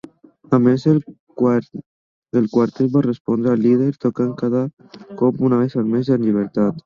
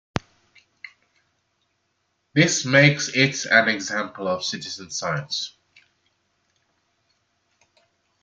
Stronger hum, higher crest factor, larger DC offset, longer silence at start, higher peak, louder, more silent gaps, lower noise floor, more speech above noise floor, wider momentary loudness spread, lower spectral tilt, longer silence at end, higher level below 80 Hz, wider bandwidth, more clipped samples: neither; second, 16 dB vs 24 dB; neither; second, 0.5 s vs 0.85 s; about the same, -2 dBFS vs 0 dBFS; first, -18 LUFS vs -21 LUFS; first, 1.20-1.27 s, 1.86-2.22 s, 3.20-3.25 s, 4.73-4.77 s vs none; second, -43 dBFS vs -72 dBFS; second, 25 dB vs 51 dB; second, 7 LU vs 18 LU; first, -9.5 dB/octave vs -3.5 dB/octave; second, 0.05 s vs 2.75 s; about the same, -60 dBFS vs -60 dBFS; second, 7 kHz vs 9.4 kHz; neither